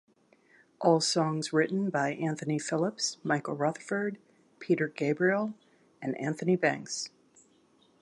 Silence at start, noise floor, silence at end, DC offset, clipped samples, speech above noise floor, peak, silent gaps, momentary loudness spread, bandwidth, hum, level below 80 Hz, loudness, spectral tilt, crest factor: 0.8 s; -65 dBFS; 0.95 s; under 0.1%; under 0.1%; 36 dB; -10 dBFS; none; 10 LU; 11.5 kHz; none; -80 dBFS; -30 LUFS; -4.5 dB/octave; 20 dB